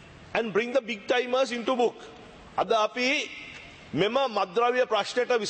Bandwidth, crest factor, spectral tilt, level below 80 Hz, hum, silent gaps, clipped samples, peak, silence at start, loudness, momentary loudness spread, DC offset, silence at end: 8.8 kHz; 18 dB; -3.5 dB/octave; -64 dBFS; none; none; under 0.1%; -10 dBFS; 0 s; -27 LUFS; 12 LU; under 0.1%; 0 s